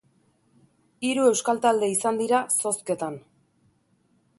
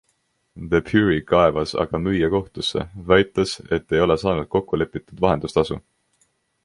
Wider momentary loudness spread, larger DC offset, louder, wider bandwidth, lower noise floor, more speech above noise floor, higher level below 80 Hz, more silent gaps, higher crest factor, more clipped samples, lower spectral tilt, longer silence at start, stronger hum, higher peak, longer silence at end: about the same, 9 LU vs 8 LU; neither; second, -24 LUFS vs -21 LUFS; about the same, 12 kHz vs 11.5 kHz; about the same, -66 dBFS vs -69 dBFS; second, 43 dB vs 48 dB; second, -74 dBFS vs -42 dBFS; neither; about the same, 20 dB vs 20 dB; neither; second, -3 dB/octave vs -6 dB/octave; first, 1 s vs 0.55 s; neither; second, -8 dBFS vs 0 dBFS; first, 1.2 s vs 0.85 s